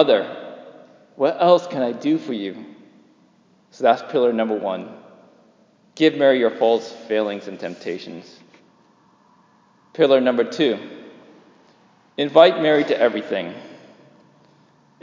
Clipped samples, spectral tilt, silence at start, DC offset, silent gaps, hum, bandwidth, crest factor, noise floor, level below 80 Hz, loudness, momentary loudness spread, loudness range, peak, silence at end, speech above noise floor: under 0.1%; -6 dB/octave; 0 s; under 0.1%; none; none; 7.6 kHz; 20 dB; -57 dBFS; -76 dBFS; -19 LUFS; 21 LU; 5 LU; 0 dBFS; 1.3 s; 38 dB